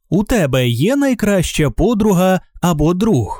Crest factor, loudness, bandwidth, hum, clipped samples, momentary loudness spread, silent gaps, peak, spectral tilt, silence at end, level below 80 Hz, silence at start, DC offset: 12 dB; -15 LUFS; 19 kHz; none; under 0.1%; 3 LU; none; -2 dBFS; -6 dB/octave; 0 s; -30 dBFS; 0.1 s; under 0.1%